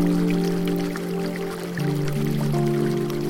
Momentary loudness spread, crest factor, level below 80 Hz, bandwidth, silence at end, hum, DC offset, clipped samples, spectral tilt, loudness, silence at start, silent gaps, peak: 5 LU; 12 dB; -46 dBFS; 17 kHz; 0 s; none; under 0.1%; under 0.1%; -7 dB/octave; -24 LUFS; 0 s; none; -10 dBFS